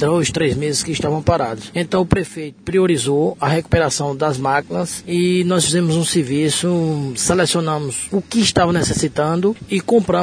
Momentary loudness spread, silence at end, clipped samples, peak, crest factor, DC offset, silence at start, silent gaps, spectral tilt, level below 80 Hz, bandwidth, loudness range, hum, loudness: 6 LU; 0 s; under 0.1%; 0 dBFS; 16 dB; under 0.1%; 0 s; none; -4.5 dB/octave; -40 dBFS; 11 kHz; 1 LU; none; -17 LUFS